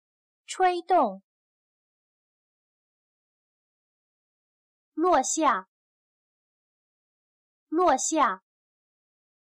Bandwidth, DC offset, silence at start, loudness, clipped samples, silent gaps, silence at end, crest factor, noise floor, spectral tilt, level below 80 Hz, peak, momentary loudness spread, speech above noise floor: 12 kHz; under 0.1%; 0.5 s; -25 LUFS; under 0.1%; 1.23-4.92 s, 5.68-7.67 s; 1.2 s; 18 dB; under -90 dBFS; -2 dB/octave; -68 dBFS; -12 dBFS; 10 LU; over 66 dB